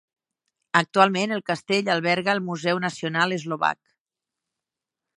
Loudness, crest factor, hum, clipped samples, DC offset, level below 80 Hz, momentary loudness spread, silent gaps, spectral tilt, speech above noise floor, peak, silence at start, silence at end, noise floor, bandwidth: -23 LUFS; 24 dB; none; under 0.1%; under 0.1%; -74 dBFS; 6 LU; none; -4.5 dB/octave; 65 dB; -2 dBFS; 0.75 s; 1.45 s; -88 dBFS; 11 kHz